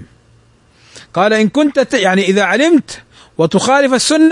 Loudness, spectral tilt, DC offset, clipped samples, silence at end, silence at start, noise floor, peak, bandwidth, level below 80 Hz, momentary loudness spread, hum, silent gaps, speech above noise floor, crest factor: -12 LUFS; -4 dB/octave; under 0.1%; under 0.1%; 0 s; 0 s; -49 dBFS; 0 dBFS; 11 kHz; -54 dBFS; 11 LU; none; none; 38 dB; 14 dB